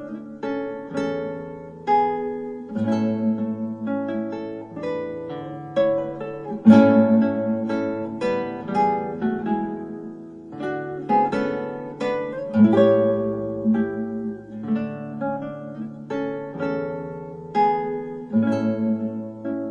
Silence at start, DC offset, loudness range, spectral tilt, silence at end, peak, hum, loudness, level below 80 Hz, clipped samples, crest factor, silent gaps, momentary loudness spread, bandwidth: 0 s; under 0.1%; 7 LU; -8.5 dB/octave; 0 s; -2 dBFS; none; -23 LUFS; -62 dBFS; under 0.1%; 20 dB; none; 15 LU; 7.2 kHz